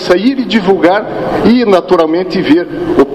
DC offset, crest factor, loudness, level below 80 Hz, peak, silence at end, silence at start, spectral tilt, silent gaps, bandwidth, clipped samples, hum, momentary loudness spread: under 0.1%; 10 dB; -10 LUFS; -40 dBFS; 0 dBFS; 0 s; 0 s; -6.5 dB/octave; none; 12.5 kHz; 0.4%; none; 4 LU